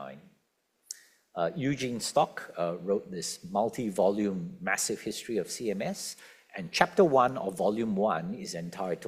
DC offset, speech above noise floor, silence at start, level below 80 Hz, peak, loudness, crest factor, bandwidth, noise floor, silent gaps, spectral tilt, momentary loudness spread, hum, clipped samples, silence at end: under 0.1%; 45 dB; 0 s; -68 dBFS; -4 dBFS; -30 LUFS; 26 dB; 15.5 kHz; -75 dBFS; none; -4.5 dB/octave; 16 LU; none; under 0.1%; 0 s